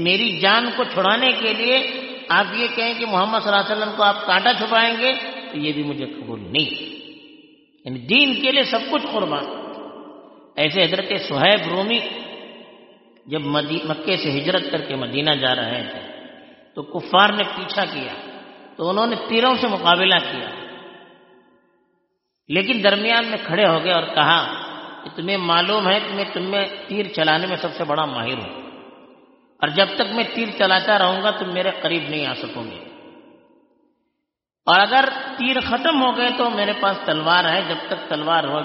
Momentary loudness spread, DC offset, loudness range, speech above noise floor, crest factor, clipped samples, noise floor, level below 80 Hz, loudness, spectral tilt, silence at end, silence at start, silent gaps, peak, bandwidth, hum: 17 LU; under 0.1%; 4 LU; 60 dB; 20 dB; under 0.1%; -80 dBFS; -64 dBFS; -19 LUFS; -1 dB/octave; 0 s; 0 s; none; 0 dBFS; 6 kHz; none